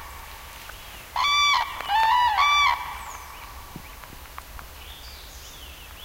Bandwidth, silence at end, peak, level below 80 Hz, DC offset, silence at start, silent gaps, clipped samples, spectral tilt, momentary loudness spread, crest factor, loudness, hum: 16 kHz; 0 s; -8 dBFS; -46 dBFS; under 0.1%; 0 s; none; under 0.1%; 0 dB/octave; 22 LU; 18 dB; -21 LUFS; none